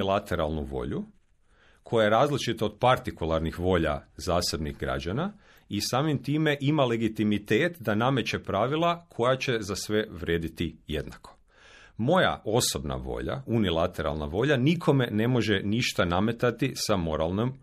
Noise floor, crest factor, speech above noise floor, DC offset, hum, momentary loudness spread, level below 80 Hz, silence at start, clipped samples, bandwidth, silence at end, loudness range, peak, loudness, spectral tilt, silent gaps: -61 dBFS; 18 dB; 35 dB; under 0.1%; none; 9 LU; -46 dBFS; 0 s; under 0.1%; 14.5 kHz; 0.05 s; 3 LU; -10 dBFS; -27 LUFS; -5.5 dB/octave; none